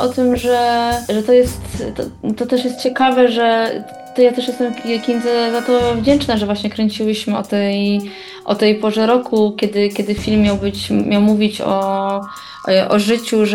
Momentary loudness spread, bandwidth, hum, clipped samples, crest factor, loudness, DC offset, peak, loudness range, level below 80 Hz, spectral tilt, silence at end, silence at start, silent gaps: 9 LU; 17 kHz; none; under 0.1%; 14 dB; -16 LUFS; under 0.1%; -2 dBFS; 1 LU; -40 dBFS; -5.5 dB/octave; 0 s; 0 s; none